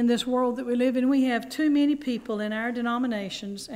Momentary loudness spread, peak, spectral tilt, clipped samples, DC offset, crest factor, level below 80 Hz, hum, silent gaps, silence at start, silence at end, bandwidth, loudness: 7 LU; -14 dBFS; -5 dB/octave; under 0.1%; under 0.1%; 12 dB; -62 dBFS; none; none; 0 s; 0 s; 15.5 kHz; -26 LUFS